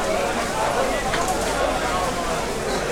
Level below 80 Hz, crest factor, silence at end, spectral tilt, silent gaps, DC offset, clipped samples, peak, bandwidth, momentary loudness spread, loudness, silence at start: -36 dBFS; 14 dB; 0 s; -3.5 dB/octave; none; under 0.1%; under 0.1%; -10 dBFS; 19 kHz; 3 LU; -23 LUFS; 0 s